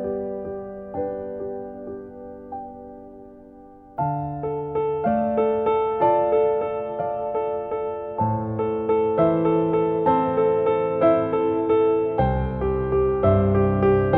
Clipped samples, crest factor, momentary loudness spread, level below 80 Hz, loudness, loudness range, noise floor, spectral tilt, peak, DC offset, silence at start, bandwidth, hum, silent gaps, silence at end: under 0.1%; 16 dB; 16 LU; -42 dBFS; -22 LUFS; 12 LU; -45 dBFS; -11.5 dB/octave; -6 dBFS; under 0.1%; 0 s; 4 kHz; none; none; 0 s